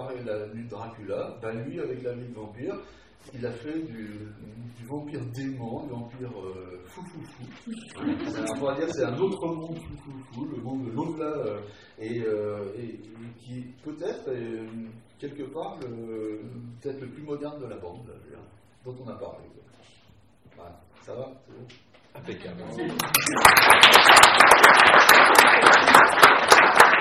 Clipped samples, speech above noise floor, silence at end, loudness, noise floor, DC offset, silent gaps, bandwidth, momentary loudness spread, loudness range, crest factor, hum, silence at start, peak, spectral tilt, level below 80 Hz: under 0.1%; 33 dB; 0 s; -16 LUFS; -57 dBFS; under 0.1%; none; 16 kHz; 27 LU; 25 LU; 22 dB; none; 0 s; 0 dBFS; -2 dB/octave; -58 dBFS